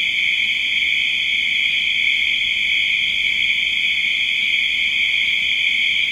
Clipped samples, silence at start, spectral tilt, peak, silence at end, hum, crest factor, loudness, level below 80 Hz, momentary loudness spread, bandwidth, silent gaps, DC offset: under 0.1%; 0 s; 1 dB/octave; -6 dBFS; 0 s; none; 12 dB; -16 LUFS; -54 dBFS; 1 LU; 16.5 kHz; none; under 0.1%